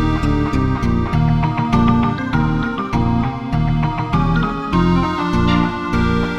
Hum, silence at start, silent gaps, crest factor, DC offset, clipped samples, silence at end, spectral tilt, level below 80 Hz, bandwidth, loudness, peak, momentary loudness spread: none; 0 s; none; 14 dB; under 0.1%; under 0.1%; 0 s; -8 dB/octave; -26 dBFS; 8.8 kHz; -17 LUFS; -2 dBFS; 4 LU